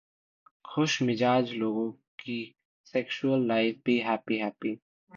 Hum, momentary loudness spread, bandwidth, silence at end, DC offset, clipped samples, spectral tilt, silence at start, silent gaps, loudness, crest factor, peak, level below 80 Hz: none; 11 LU; 7.4 kHz; 0 s; under 0.1%; under 0.1%; -5.5 dB/octave; 0.65 s; 2.08-2.18 s, 2.65-2.84 s, 4.82-5.07 s; -29 LUFS; 16 dB; -14 dBFS; -74 dBFS